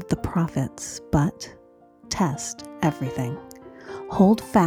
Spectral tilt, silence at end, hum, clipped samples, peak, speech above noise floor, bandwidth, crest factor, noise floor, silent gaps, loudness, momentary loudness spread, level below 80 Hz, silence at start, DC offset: -6 dB/octave; 0 s; none; under 0.1%; -4 dBFS; 29 dB; 15.5 kHz; 20 dB; -52 dBFS; none; -25 LUFS; 20 LU; -46 dBFS; 0 s; under 0.1%